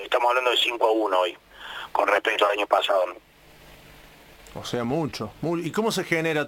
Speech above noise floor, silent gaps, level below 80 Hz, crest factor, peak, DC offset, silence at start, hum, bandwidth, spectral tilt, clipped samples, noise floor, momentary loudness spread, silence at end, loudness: 27 dB; none; -58 dBFS; 20 dB; -6 dBFS; under 0.1%; 0 s; none; 17 kHz; -4 dB/octave; under 0.1%; -50 dBFS; 11 LU; 0 s; -23 LUFS